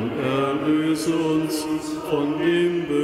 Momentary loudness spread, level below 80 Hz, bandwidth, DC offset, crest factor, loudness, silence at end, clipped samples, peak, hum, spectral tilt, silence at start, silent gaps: 5 LU; -56 dBFS; 15.5 kHz; under 0.1%; 12 dB; -22 LUFS; 0 s; under 0.1%; -10 dBFS; none; -5.5 dB/octave; 0 s; none